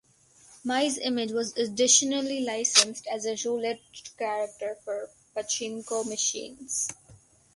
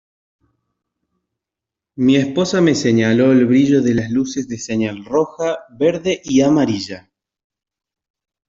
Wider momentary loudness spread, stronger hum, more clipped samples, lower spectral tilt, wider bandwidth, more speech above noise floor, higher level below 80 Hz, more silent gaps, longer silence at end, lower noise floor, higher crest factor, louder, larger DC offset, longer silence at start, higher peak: first, 16 LU vs 10 LU; neither; neither; second, -0.5 dB/octave vs -6 dB/octave; first, 11.5 kHz vs 7.8 kHz; second, 30 dB vs 70 dB; second, -72 dBFS vs -54 dBFS; neither; second, 0.4 s vs 1.5 s; second, -58 dBFS vs -85 dBFS; first, 26 dB vs 14 dB; second, -27 LUFS vs -16 LUFS; neither; second, 0.5 s vs 1.95 s; about the same, -4 dBFS vs -2 dBFS